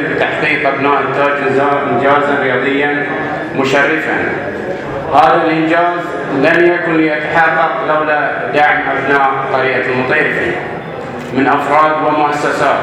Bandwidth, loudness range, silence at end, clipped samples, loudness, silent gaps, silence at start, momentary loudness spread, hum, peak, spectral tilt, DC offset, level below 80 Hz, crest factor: 13 kHz; 2 LU; 0 s; under 0.1%; -12 LUFS; none; 0 s; 8 LU; none; 0 dBFS; -6 dB/octave; under 0.1%; -48 dBFS; 12 dB